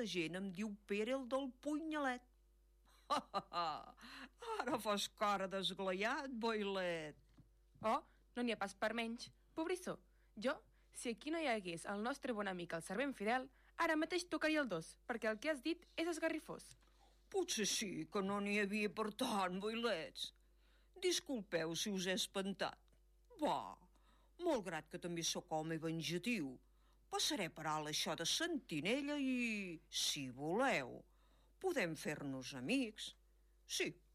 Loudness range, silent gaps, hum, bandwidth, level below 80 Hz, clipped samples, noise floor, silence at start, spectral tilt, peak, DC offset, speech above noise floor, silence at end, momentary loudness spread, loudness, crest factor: 4 LU; none; none; 15 kHz; -72 dBFS; under 0.1%; -72 dBFS; 0 s; -3.5 dB/octave; -28 dBFS; under 0.1%; 30 dB; 0.2 s; 9 LU; -42 LUFS; 14 dB